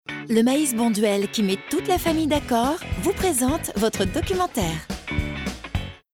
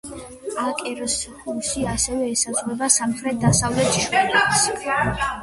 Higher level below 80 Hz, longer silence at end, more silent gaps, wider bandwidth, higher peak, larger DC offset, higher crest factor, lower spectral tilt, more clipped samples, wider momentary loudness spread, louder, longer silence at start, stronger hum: about the same, -38 dBFS vs -42 dBFS; first, 0.2 s vs 0 s; neither; first, 18.5 kHz vs 12 kHz; second, -8 dBFS vs -2 dBFS; neither; about the same, 16 dB vs 20 dB; first, -4.5 dB/octave vs -3 dB/octave; neither; about the same, 9 LU vs 9 LU; second, -23 LUFS vs -20 LUFS; about the same, 0.1 s vs 0.05 s; neither